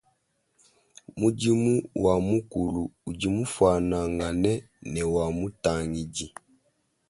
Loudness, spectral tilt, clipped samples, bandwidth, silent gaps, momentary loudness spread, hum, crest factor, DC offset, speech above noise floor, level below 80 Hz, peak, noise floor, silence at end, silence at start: -27 LUFS; -6 dB/octave; under 0.1%; 11.5 kHz; none; 11 LU; none; 18 dB; under 0.1%; 46 dB; -46 dBFS; -8 dBFS; -72 dBFS; 0.8 s; 1.15 s